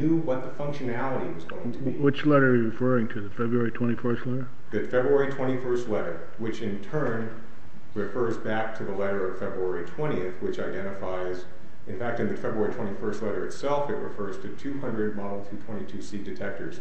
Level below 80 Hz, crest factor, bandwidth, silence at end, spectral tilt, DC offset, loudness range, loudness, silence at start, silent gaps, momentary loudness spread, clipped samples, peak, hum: -56 dBFS; 20 dB; 8.4 kHz; 0 s; -7.5 dB/octave; 5%; 6 LU; -29 LUFS; 0 s; none; 11 LU; under 0.1%; -8 dBFS; none